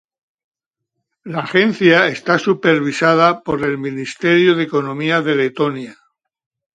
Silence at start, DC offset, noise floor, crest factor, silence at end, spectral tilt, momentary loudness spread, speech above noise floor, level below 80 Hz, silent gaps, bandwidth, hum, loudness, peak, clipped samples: 1.25 s; under 0.1%; -78 dBFS; 16 dB; 0.8 s; -6 dB/octave; 11 LU; 62 dB; -58 dBFS; none; 9.2 kHz; none; -15 LUFS; 0 dBFS; under 0.1%